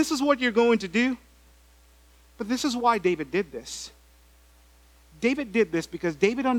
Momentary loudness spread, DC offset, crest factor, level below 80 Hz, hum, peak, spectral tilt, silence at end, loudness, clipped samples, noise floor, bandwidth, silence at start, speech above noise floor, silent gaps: 14 LU; under 0.1%; 20 dB; -56 dBFS; none; -6 dBFS; -4.5 dB/octave; 0 s; -25 LUFS; under 0.1%; -56 dBFS; 18 kHz; 0 s; 31 dB; none